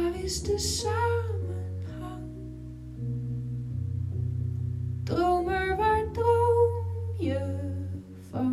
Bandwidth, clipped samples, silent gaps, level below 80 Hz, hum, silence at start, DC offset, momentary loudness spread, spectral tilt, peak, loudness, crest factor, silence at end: 14.5 kHz; under 0.1%; none; -44 dBFS; none; 0 s; under 0.1%; 14 LU; -5.5 dB/octave; -12 dBFS; -29 LUFS; 16 dB; 0 s